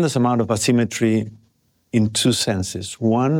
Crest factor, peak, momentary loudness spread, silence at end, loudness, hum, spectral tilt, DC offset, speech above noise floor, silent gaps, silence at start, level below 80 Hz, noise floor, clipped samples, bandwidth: 14 dB; -6 dBFS; 6 LU; 0 s; -20 LUFS; none; -5 dB/octave; under 0.1%; 43 dB; none; 0 s; -54 dBFS; -62 dBFS; under 0.1%; 16.5 kHz